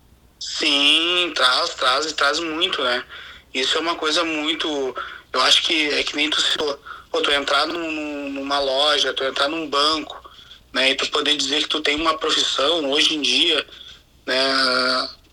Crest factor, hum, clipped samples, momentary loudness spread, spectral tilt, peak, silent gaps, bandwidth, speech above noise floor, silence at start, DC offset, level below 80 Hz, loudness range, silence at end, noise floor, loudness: 20 dB; none; under 0.1%; 11 LU; -1 dB/octave; -2 dBFS; none; 18 kHz; 24 dB; 0.4 s; under 0.1%; -54 dBFS; 2 LU; 0.15 s; -45 dBFS; -19 LUFS